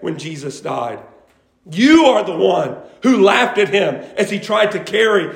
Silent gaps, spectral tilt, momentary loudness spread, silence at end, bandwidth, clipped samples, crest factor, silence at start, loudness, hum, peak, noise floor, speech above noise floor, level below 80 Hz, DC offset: none; -4.5 dB/octave; 15 LU; 0 s; 16 kHz; under 0.1%; 16 dB; 0 s; -15 LUFS; none; 0 dBFS; -53 dBFS; 38 dB; -58 dBFS; under 0.1%